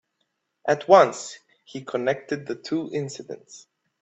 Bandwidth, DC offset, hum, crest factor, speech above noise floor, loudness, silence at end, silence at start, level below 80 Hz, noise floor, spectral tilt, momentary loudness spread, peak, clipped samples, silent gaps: 8.4 kHz; under 0.1%; none; 24 dB; 53 dB; -23 LUFS; 0.45 s; 0.65 s; -72 dBFS; -76 dBFS; -5 dB/octave; 22 LU; -2 dBFS; under 0.1%; none